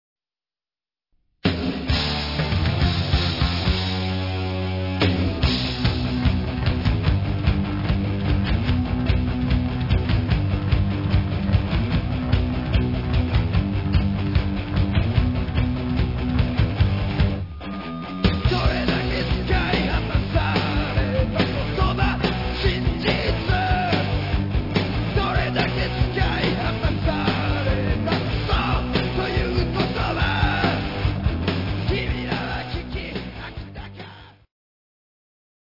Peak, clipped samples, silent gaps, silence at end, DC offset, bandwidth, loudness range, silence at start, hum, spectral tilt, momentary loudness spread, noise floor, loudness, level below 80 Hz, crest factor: -4 dBFS; under 0.1%; none; 1.3 s; 0.3%; 5.8 kHz; 2 LU; 1.45 s; none; -7.5 dB/octave; 4 LU; under -90 dBFS; -23 LUFS; -28 dBFS; 18 dB